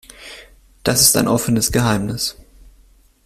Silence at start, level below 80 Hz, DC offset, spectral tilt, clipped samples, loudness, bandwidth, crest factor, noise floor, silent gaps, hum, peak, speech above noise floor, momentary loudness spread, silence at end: 0.2 s; -40 dBFS; under 0.1%; -3.5 dB/octave; under 0.1%; -16 LUFS; 16 kHz; 20 dB; -51 dBFS; none; none; 0 dBFS; 35 dB; 24 LU; 0.95 s